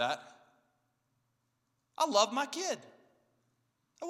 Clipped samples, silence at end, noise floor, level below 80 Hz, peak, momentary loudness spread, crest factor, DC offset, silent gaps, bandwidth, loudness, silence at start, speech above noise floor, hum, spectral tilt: under 0.1%; 0 s; -80 dBFS; under -90 dBFS; -12 dBFS; 12 LU; 24 dB; under 0.1%; none; 15 kHz; -32 LUFS; 0 s; 47 dB; none; -1.5 dB/octave